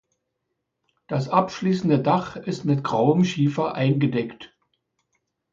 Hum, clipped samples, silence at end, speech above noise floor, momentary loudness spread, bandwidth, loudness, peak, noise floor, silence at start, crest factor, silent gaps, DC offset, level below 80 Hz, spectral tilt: none; under 0.1%; 1.05 s; 57 dB; 8 LU; 7.6 kHz; -22 LUFS; -4 dBFS; -79 dBFS; 1.1 s; 20 dB; none; under 0.1%; -62 dBFS; -7.5 dB/octave